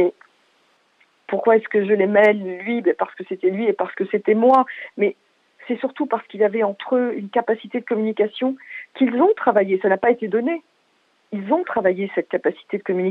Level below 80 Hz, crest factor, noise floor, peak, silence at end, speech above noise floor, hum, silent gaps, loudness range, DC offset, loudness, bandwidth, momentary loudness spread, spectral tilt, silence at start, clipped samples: -72 dBFS; 18 dB; -63 dBFS; -4 dBFS; 0 s; 43 dB; none; none; 3 LU; under 0.1%; -20 LUFS; 4.8 kHz; 10 LU; -8.5 dB/octave; 0 s; under 0.1%